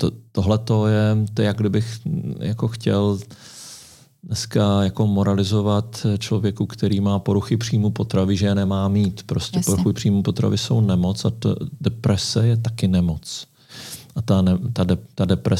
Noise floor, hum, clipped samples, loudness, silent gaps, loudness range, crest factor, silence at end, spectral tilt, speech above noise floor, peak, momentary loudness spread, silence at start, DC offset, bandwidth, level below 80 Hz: -46 dBFS; none; under 0.1%; -21 LUFS; none; 2 LU; 14 dB; 0 s; -6.5 dB/octave; 26 dB; -6 dBFS; 10 LU; 0 s; under 0.1%; 14.5 kHz; -46 dBFS